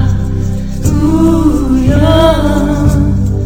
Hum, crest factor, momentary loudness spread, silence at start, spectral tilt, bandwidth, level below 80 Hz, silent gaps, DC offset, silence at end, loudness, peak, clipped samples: none; 10 dB; 8 LU; 0 s; -7.5 dB/octave; 16 kHz; -16 dBFS; none; 4%; 0 s; -11 LUFS; 0 dBFS; 0.3%